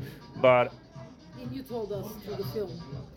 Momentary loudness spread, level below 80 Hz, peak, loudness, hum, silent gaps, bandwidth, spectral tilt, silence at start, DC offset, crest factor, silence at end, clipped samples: 25 LU; -58 dBFS; -8 dBFS; -29 LUFS; none; none; 17 kHz; -6.5 dB/octave; 0 s; under 0.1%; 22 dB; 0 s; under 0.1%